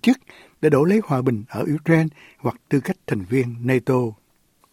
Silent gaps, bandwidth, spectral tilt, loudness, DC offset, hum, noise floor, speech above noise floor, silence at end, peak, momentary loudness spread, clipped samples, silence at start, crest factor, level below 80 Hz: none; 16.5 kHz; -7.5 dB/octave; -21 LUFS; under 0.1%; none; -61 dBFS; 41 dB; 0.6 s; -2 dBFS; 10 LU; under 0.1%; 0.05 s; 18 dB; -60 dBFS